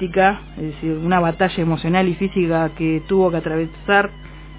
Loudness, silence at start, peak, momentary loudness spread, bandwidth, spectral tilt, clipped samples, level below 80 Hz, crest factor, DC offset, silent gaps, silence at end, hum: -19 LUFS; 0 s; 0 dBFS; 9 LU; 4 kHz; -11 dB/octave; under 0.1%; -40 dBFS; 18 dB; under 0.1%; none; 0 s; none